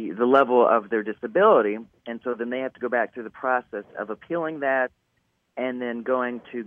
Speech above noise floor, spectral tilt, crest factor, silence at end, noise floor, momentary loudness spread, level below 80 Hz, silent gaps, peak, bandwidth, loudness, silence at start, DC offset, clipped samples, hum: 48 dB; -8 dB/octave; 20 dB; 0 s; -71 dBFS; 15 LU; -74 dBFS; none; -4 dBFS; 3.9 kHz; -24 LUFS; 0 s; under 0.1%; under 0.1%; none